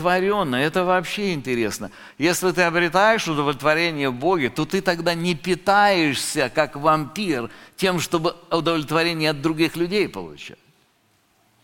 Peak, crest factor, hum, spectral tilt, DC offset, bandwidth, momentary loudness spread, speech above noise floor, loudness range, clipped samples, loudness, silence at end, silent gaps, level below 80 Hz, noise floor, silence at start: -2 dBFS; 20 dB; none; -4.5 dB/octave; under 0.1%; 17 kHz; 8 LU; 41 dB; 2 LU; under 0.1%; -21 LUFS; 1.15 s; none; -50 dBFS; -63 dBFS; 0 s